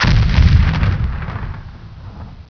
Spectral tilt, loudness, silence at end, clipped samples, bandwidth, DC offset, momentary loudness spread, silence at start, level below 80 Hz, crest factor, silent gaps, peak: -6.5 dB/octave; -15 LUFS; 0.05 s; under 0.1%; 5.4 kHz; under 0.1%; 23 LU; 0 s; -18 dBFS; 16 dB; none; 0 dBFS